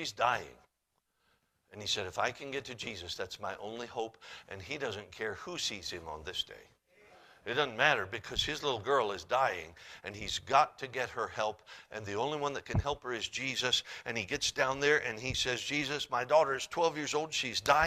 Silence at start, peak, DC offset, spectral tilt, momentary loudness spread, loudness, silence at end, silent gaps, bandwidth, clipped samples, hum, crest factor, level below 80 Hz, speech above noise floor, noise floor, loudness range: 0 s; -10 dBFS; under 0.1%; -3 dB/octave; 13 LU; -33 LUFS; 0 s; none; 15 kHz; under 0.1%; none; 26 dB; -58 dBFS; 47 dB; -81 dBFS; 8 LU